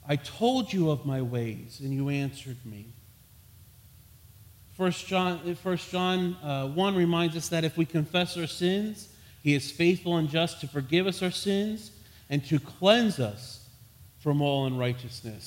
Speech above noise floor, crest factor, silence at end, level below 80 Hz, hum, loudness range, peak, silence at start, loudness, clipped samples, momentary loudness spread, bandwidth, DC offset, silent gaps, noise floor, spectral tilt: 27 dB; 22 dB; 0 s; -62 dBFS; none; 7 LU; -6 dBFS; 0.05 s; -28 LUFS; under 0.1%; 13 LU; 16.5 kHz; under 0.1%; none; -55 dBFS; -5.5 dB/octave